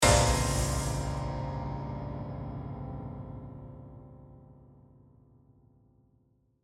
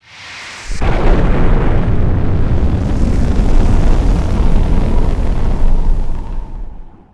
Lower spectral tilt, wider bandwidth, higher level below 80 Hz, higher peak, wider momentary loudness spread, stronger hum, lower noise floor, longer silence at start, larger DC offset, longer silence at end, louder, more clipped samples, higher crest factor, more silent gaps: second, -4 dB/octave vs -7.5 dB/octave; first, 16.5 kHz vs 7.8 kHz; second, -40 dBFS vs -12 dBFS; second, -8 dBFS vs 0 dBFS; first, 24 LU vs 13 LU; neither; first, -69 dBFS vs -32 dBFS; second, 0 s vs 0.2 s; neither; first, 2 s vs 0.25 s; second, -32 LUFS vs -16 LUFS; neither; first, 24 dB vs 10 dB; neither